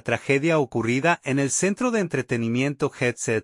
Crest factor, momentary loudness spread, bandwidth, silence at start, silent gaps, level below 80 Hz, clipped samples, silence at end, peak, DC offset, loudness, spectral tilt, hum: 18 dB; 4 LU; 11.5 kHz; 0.05 s; none; -60 dBFS; under 0.1%; 0 s; -6 dBFS; under 0.1%; -23 LUFS; -5 dB/octave; none